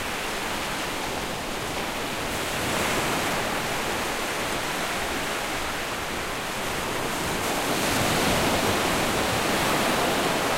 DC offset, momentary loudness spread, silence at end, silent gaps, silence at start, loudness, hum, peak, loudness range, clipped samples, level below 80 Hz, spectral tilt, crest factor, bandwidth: under 0.1%; 6 LU; 0 s; none; 0 s; -25 LUFS; none; -10 dBFS; 4 LU; under 0.1%; -44 dBFS; -3 dB/octave; 16 dB; 16 kHz